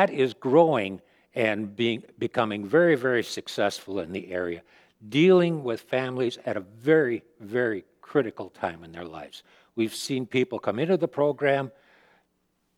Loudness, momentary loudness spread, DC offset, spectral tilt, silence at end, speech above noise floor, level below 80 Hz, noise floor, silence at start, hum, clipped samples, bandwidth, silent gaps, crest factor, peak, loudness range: -26 LUFS; 15 LU; under 0.1%; -6 dB/octave; 1.1 s; 47 dB; -70 dBFS; -73 dBFS; 0 s; none; under 0.1%; 15.5 kHz; none; 20 dB; -6 dBFS; 5 LU